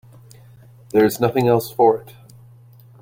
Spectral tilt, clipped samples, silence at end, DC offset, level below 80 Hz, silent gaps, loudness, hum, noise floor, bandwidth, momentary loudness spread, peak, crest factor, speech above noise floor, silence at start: -6.5 dB/octave; under 0.1%; 1 s; under 0.1%; -56 dBFS; none; -18 LUFS; none; -46 dBFS; 16.5 kHz; 4 LU; -2 dBFS; 18 dB; 29 dB; 0.95 s